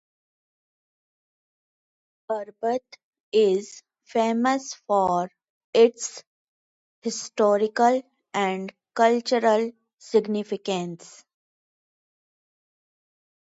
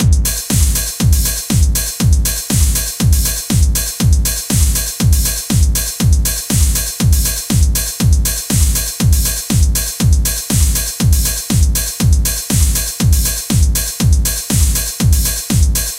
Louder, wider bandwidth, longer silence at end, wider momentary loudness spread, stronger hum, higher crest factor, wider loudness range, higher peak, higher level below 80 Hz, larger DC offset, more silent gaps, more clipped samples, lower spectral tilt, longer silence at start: second, -24 LUFS vs -14 LUFS; second, 8 kHz vs 17 kHz; first, 2.65 s vs 0 s; first, 13 LU vs 2 LU; neither; first, 20 dB vs 12 dB; first, 7 LU vs 0 LU; second, -6 dBFS vs 0 dBFS; second, -74 dBFS vs -16 dBFS; neither; first, 3.04-3.11 s, 3.20-3.32 s, 5.50-5.73 s, 6.27-7.02 s vs none; neither; about the same, -4.5 dB/octave vs -3.5 dB/octave; first, 2.3 s vs 0 s